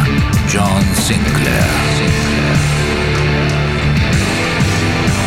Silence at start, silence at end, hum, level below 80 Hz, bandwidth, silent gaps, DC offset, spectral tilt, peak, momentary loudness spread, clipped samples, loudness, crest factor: 0 s; 0 s; none; -24 dBFS; 16.5 kHz; none; under 0.1%; -5 dB/octave; 0 dBFS; 2 LU; under 0.1%; -14 LUFS; 12 dB